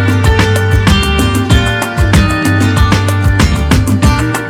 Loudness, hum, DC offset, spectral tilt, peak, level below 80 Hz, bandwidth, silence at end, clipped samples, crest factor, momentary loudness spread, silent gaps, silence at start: -10 LUFS; none; under 0.1%; -5.5 dB/octave; 0 dBFS; -16 dBFS; 16 kHz; 0 s; under 0.1%; 10 dB; 2 LU; none; 0 s